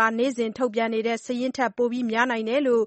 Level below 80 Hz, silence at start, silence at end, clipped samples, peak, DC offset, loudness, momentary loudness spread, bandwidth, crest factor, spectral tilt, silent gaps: -70 dBFS; 0 s; 0 s; under 0.1%; -8 dBFS; under 0.1%; -25 LUFS; 4 LU; 8.4 kHz; 16 dB; -4.5 dB/octave; none